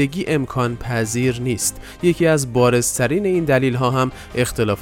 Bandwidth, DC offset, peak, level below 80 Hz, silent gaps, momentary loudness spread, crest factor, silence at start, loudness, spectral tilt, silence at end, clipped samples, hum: 17 kHz; under 0.1%; -4 dBFS; -42 dBFS; none; 6 LU; 16 dB; 0 s; -19 LUFS; -5 dB/octave; 0 s; under 0.1%; none